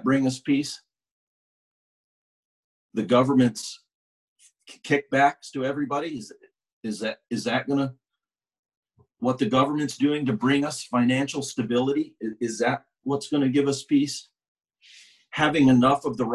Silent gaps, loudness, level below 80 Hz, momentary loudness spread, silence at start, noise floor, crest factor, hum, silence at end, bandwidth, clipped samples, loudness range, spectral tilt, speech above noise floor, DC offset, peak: 1.11-2.89 s, 3.95-4.36 s, 6.73-6.81 s, 8.59-8.63 s, 8.77-8.83 s, 14.48-14.55 s; -24 LUFS; -64 dBFS; 14 LU; 0 s; -87 dBFS; 18 dB; none; 0 s; 12 kHz; under 0.1%; 5 LU; -5.5 dB/octave; 64 dB; under 0.1%; -6 dBFS